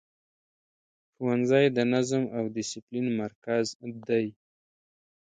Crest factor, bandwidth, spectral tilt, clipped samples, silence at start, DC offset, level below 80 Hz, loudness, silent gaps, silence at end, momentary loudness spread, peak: 20 dB; 9.4 kHz; -5.5 dB/octave; under 0.1%; 1.2 s; under 0.1%; -72 dBFS; -28 LUFS; 2.82-2.87 s, 3.35-3.42 s, 3.75-3.80 s; 1 s; 11 LU; -10 dBFS